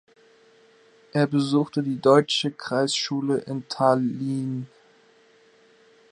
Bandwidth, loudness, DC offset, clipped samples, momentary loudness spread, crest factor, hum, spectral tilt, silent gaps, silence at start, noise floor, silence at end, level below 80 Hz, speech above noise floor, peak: 11 kHz; -23 LUFS; under 0.1%; under 0.1%; 11 LU; 22 dB; none; -5.5 dB/octave; none; 1.15 s; -57 dBFS; 1.45 s; -74 dBFS; 34 dB; -4 dBFS